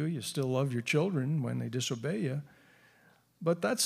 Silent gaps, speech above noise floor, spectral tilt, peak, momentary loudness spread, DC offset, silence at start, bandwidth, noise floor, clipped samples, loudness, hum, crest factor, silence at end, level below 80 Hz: none; 33 dB; -5 dB/octave; -16 dBFS; 5 LU; under 0.1%; 0 s; 15.5 kHz; -65 dBFS; under 0.1%; -33 LUFS; none; 18 dB; 0 s; -78 dBFS